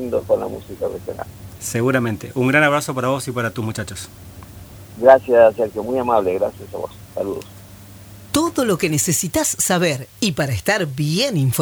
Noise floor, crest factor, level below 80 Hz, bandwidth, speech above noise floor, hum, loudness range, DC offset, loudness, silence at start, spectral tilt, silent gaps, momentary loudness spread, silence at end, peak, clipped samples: -40 dBFS; 20 dB; -48 dBFS; over 20 kHz; 22 dB; none; 4 LU; under 0.1%; -18 LUFS; 0 s; -4.5 dB/octave; none; 18 LU; 0 s; 0 dBFS; under 0.1%